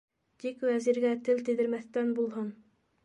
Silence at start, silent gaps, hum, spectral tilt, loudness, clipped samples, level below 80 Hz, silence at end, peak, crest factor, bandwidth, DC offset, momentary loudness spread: 0.45 s; none; none; -6 dB/octave; -31 LUFS; under 0.1%; -82 dBFS; 0.5 s; -16 dBFS; 14 dB; 10.5 kHz; under 0.1%; 11 LU